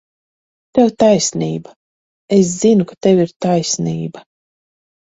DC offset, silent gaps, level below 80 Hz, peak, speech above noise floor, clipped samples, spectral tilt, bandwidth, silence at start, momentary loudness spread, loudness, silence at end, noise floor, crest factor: under 0.1%; 1.76-2.28 s, 3.36-3.40 s; -54 dBFS; 0 dBFS; over 76 dB; under 0.1%; -5.5 dB/octave; 8 kHz; 0.75 s; 10 LU; -15 LUFS; 0.85 s; under -90 dBFS; 16 dB